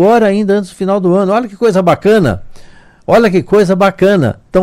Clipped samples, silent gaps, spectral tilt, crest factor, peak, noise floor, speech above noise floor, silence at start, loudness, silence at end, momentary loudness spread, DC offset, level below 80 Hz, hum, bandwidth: under 0.1%; none; -7 dB/octave; 10 dB; 0 dBFS; -36 dBFS; 26 dB; 0 s; -11 LUFS; 0 s; 5 LU; under 0.1%; -38 dBFS; none; 16 kHz